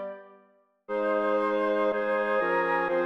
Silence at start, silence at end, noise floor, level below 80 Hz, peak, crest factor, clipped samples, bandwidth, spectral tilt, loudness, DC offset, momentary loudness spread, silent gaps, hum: 0 s; 0 s; -63 dBFS; -70 dBFS; -14 dBFS; 12 dB; under 0.1%; 6.2 kHz; -6.5 dB/octave; -27 LUFS; under 0.1%; 8 LU; none; none